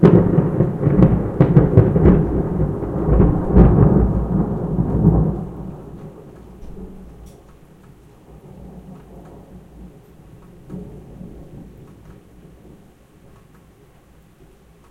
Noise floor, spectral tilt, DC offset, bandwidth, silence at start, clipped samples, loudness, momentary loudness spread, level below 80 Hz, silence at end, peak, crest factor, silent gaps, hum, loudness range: -49 dBFS; -11.5 dB/octave; under 0.1%; 3.9 kHz; 0 s; under 0.1%; -16 LUFS; 26 LU; -26 dBFS; 3.25 s; 0 dBFS; 18 dB; none; none; 25 LU